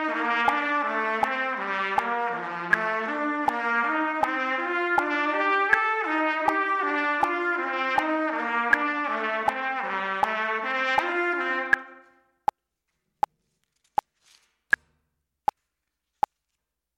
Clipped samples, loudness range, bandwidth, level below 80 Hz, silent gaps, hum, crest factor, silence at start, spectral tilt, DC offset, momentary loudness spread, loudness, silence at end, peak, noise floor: under 0.1%; 9 LU; 15.5 kHz; -66 dBFS; none; none; 20 dB; 0 s; -4 dB/octave; under 0.1%; 9 LU; -25 LUFS; 5 s; -6 dBFS; -83 dBFS